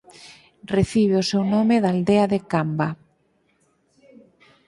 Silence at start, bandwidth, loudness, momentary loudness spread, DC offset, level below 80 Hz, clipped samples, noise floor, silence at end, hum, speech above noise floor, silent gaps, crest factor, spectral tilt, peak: 0.25 s; 11.5 kHz; -21 LUFS; 7 LU; under 0.1%; -52 dBFS; under 0.1%; -65 dBFS; 1.75 s; none; 45 dB; none; 16 dB; -6.5 dB/octave; -6 dBFS